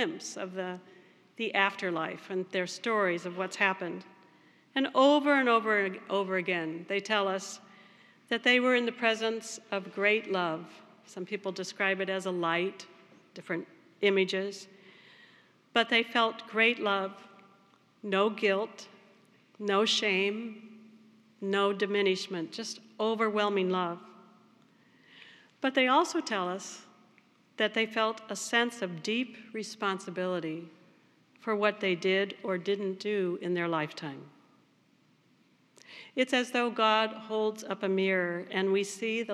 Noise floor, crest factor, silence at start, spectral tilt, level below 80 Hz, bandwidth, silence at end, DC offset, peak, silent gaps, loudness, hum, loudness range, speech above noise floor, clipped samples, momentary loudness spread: -66 dBFS; 22 dB; 0 s; -4 dB/octave; under -90 dBFS; 13 kHz; 0 s; under 0.1%; -10 dBFS; none; -30 LUFS; none; 5 LU; 36 dB; under 0.1%; 14 LU